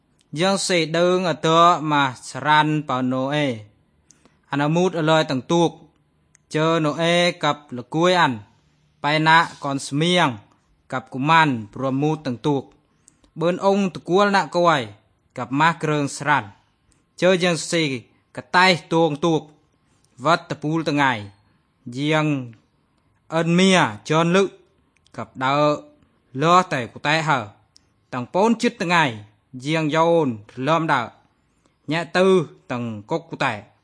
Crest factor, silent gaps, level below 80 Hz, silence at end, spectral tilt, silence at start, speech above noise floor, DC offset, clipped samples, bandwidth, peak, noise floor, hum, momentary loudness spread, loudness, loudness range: 20 dB; none; -66 dBFS; 0.2 s; -5 dB/octave; 0.35 s; 44 dB; under 0.1%; under 0.1%; 10.5 kHz; 0 dBFS; -64 dBFS; none; 13 LU; -20 LUFS; 3 LU